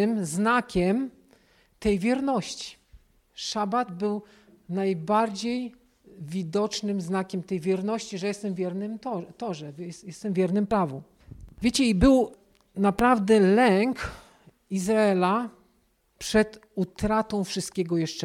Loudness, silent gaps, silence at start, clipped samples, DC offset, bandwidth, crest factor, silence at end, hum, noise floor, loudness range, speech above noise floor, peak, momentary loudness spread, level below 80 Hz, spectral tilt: -26 LUFS; none; 0 s; under 0.1%; under 0.1%; 15.5 kHz; 18 dB; 0 s; none; -67 dBFS; 7 LU; 42 dB; -8 dBFS; 15 LU; -46 dBFS; -5.5 dB/octave